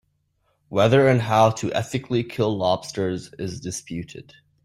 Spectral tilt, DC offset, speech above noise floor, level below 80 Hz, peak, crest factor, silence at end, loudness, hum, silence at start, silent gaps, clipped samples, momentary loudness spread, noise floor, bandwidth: -6 dB/octave; under 0.1%; 47 dB; -56 dBFS; -4 dBFS; 18 dB; 0.45 s; -22 LUFS; none; 0.7 s; none; under 0.1%; 16 LU; -69 dBFS; 13 kHz